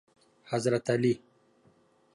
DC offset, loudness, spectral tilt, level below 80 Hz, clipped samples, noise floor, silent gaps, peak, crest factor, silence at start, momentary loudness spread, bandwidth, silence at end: under 0.1%; -29 LUFS; -6 dB/octave; -72 dBFS; under 0.1%; -65 dBFS; none; -14 dBFS; 18 dB; 0.5 s; 8 LU; 11.5 kHz; 1 s